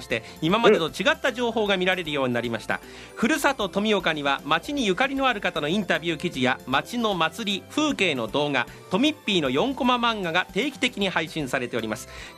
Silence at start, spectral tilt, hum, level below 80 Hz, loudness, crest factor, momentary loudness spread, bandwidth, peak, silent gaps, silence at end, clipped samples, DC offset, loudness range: 0 s; -4.5 dB/octave; none; -54 dBFS; -24 LUFS; 22 dB; 6 LU; 15 kHz; -2 dBFS; none; 0 s; under 0.1%; under 0.1%; 1 LU